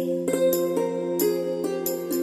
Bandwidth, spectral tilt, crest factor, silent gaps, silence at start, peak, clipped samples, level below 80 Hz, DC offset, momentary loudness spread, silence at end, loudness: 16 kHz; -5 dB/octave; 14 dB; none; 0 s; -10 dBFS; under 0.1%; -68 dBFS; under 0.1%; 5 LU; 0 s; -25 LUFS